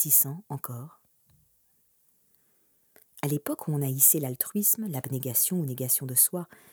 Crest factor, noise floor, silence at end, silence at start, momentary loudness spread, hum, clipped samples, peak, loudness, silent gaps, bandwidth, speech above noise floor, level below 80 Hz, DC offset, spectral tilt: 24 dB; -67 dBFS; 0.25 s; 0 s; 17 LU; none; under 0.1%; -4 dBFS; -24 LUFS; none; over 20 kHz; 40 dB; -78 dBFS; under 0.1%; -4 dB/octave